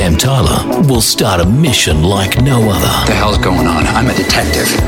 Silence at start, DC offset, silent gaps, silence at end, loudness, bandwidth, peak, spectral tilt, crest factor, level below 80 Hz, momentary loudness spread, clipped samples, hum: 0 s; under 0.1%; none; 0 s; -11 LUFS; 19 kHz; 0 dBFS; -4.5 dB/octave; 10 dB; -22 dBFS; 2 LU; under 0.1%; none